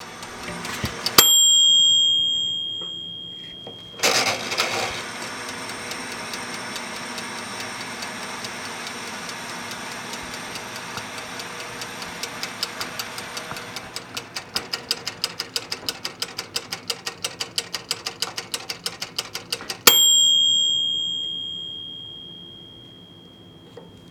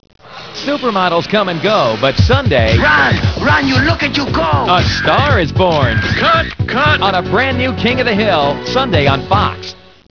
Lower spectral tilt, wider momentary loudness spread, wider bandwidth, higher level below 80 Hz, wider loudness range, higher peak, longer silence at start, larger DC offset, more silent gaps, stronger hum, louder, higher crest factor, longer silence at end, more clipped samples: second, 0 dB/octave vs -6 dB/octave; first, 19 LU vs 5 LU; first, over 20 kHz vs 5.4 kHz; second, -58 dBFS vs -30 dBFS; first, 14 LU vs 1 LU; about the same, -2 dBFS vs 0 dBFS; second, 0 s vs 0.25 s; second, under 0.1% vs 0.5%; neither; neither; second, -21 LUFS vs -12 LUFS; first, 24 dB vs 12 dB; second, 0 s vs 0.4 s; neither